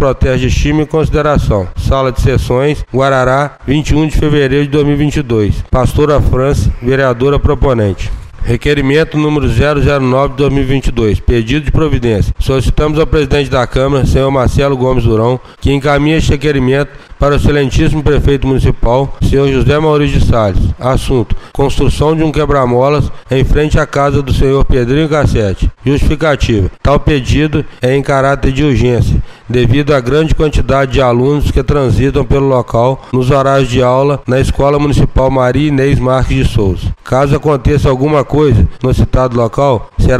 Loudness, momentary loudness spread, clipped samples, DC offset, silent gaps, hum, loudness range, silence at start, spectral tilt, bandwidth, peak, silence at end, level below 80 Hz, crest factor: -11 LUFS; 4 LU; under 0.1%; 0.4%; none; none; 1 LU; 0 s; -7 dB/octave; 13.5 kHz; 0 dBFS; 0 s; -18 dBFS; 10 dB